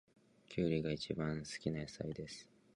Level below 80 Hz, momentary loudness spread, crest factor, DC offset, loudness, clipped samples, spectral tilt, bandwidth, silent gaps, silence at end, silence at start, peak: -62 dBFS; 11 LU; 20 dB; under 0.1%; -41 LUFS; under 0.1%; -6 dB/octave; 11 kHz; none; 0.3 s; 0.5 s; -22 dBFS